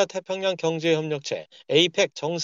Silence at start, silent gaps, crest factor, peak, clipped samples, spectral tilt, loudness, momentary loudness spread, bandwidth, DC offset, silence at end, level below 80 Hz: 0 s; none; 18 dB; -6 dBFS; under 0.1%; -4 dB/octave; -24 LUFS; 9 LU; 7.8 kHz; under 0.1%; 0 s; -76 dBFS